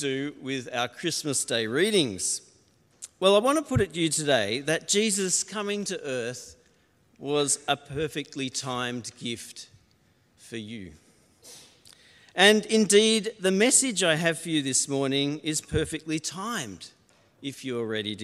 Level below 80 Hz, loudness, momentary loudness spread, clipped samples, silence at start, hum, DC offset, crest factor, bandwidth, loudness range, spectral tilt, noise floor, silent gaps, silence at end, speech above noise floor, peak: -58 dBFS; -25 LUFS; 18 LU; under 0.1%; 0 s; none; under 0.1%; 24 dB; 14 kHz; 12 LU; -3 dB/octave; -64 dBFS; none; 0 s; 38 dB; -4 dBFS